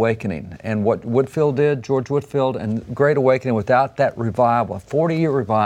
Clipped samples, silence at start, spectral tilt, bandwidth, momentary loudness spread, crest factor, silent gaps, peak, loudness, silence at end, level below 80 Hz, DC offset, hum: under 0.1%; 0 s; -8 dB/octave; 10.5 kHz; 8 LU; 16 dB; none; -2 dBFS; -20 LUFS; 0 s; -52 dBFS; under 0.1%; none